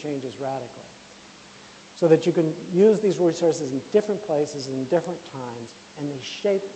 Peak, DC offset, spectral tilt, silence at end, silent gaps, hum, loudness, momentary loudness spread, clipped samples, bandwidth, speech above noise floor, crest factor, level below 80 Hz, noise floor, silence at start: -4 dBFS; under 0.1%; -6 dB/octave; 0 s; none; none; -22 LUFS; 22 LU; under 0.1%; 8.8 kHz; 23 dB; 20 dB; -68 dBFS; -45 dBFS; 0 s